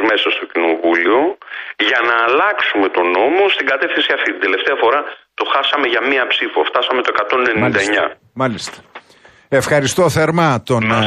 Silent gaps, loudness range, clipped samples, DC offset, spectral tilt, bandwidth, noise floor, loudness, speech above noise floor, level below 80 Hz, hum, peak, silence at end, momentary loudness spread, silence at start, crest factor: none; 2 LU; under 0.1%; under 0.1%; -4.5 dB/octave; 13.5 kHz; -47 dBFS; -15 LUFS; 32 dB; -54 dBFS; none; -2 dBFS; 0 s; 7 LU; 0 s; 14 dB